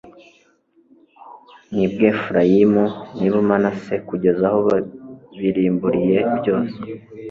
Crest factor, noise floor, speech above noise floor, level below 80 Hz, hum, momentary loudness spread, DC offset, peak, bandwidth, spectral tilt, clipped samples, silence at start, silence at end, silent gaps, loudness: 18 dB; -58 dBFS; 40 dB; -54 dBFS; none; 14 LU; under 0.1%; 0 dBFS; 7 kHz; -9 dB/octave; under 0.1%; 0.05 s; 0 s; none; -18 LUFS